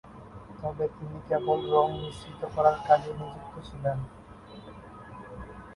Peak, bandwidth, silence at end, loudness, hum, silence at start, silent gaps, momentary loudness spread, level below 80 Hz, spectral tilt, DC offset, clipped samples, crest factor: -8 dBFS; 11.5 kHz; 0 s; -28 LUFS; none; 0.05 s; none; 22 LU; -52 dBFS; -7 dB/octave; under 0.1%; under 0.1%; 22 dB